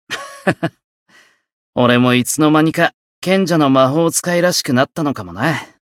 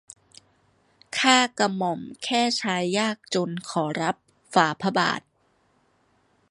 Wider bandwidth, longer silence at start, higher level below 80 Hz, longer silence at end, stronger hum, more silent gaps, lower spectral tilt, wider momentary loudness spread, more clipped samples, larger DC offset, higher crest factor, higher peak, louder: first, 16.5 kHz vs 11.5 kHz; second, 0.1 s vs 1.1 s; first, -58 dBFS vs -72 dBFS; second, 0.25 s vs 1.3 s; neither; first, 0.84-1.06 s, 1.53-1.73 s, 2.94-3.22 s vs none; about the same, -4.5 dB/octave vs -3.5 dB/octave; about the same, 11 LU vs 10 LU; neither; neither; second, 16 dB vs 24 dB; about the same, 0 dBFS vs -2 dBFS; first, -15 LUFS vs -24 LUFS